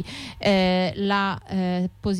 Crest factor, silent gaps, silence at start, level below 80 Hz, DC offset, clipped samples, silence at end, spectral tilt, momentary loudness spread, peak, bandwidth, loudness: 12 dB; none; 0 s; -48 dBFS; under 0.1%; under 0.1%; 0 s; -6.5 dB/octave; 6 LU; -10 dBFS; 11 kHz; -23 LUFS